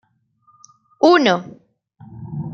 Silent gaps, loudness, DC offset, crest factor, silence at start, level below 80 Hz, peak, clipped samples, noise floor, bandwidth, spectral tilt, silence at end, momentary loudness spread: none; -16 LUFS; under 0.1%; 18 dB; 1 s; -62 dBFS; -2 dBFS; under 0.1%; -60 dBFS; 7.2 kHz; -5.5 dB/octave; 0 s; 25 LU